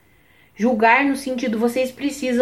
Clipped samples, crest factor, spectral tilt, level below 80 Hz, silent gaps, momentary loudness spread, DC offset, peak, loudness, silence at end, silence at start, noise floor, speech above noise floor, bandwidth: under 0.1%; 18 dB; -4.5 dB/octave; -58 dBFS; none; 9 LU; under 0.1%; -2 dBFS; -19 LUFS; 0 s; 0.6 s; -55 dBFS; 36 dB; 16 kHz